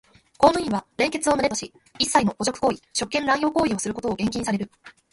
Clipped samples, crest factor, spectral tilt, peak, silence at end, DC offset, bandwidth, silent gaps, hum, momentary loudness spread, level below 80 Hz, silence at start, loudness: under 0.1%; 22 dB; -3.5 dB/octave; -2 dBFS; 0.25 s; under 0.1%; 11.5 kHz; none; none; 8 LU; -52 dBFS; 0.4 s; -23 LUFS